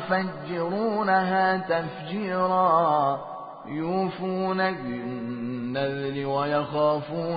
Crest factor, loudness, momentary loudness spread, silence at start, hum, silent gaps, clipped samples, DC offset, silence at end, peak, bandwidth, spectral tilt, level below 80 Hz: 16 dB; -26 LUFS; 11 LU; 0 s; none; none; under 0.1%; under 0.1%; 0 s; -10 dBFS; 5 kHz; -10.5 dB/octave; -66 dBFS